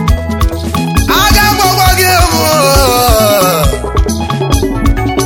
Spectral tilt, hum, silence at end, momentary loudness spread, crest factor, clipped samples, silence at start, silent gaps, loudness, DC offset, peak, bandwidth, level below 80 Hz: -4 dB/octave; none; 0 s; 7 LU; 10 dB; 0.3%; 0 s; none; -9 LUFS; under 0.1%; 0 dBFS; 17.5 kHz; -16 dBFS